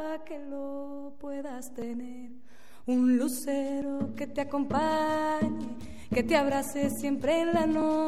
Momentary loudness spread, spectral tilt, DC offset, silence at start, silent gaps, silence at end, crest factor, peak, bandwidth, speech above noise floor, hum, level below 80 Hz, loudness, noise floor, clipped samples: 14 LU; -5 dB/octave; 0.9%; 0 s; none; 0 s; 18 dB; -12 dBFS; 15.5 kHz; 28 dB; none; -58 dBFS; -30 LUFS; -57 dBFS; under 0.1%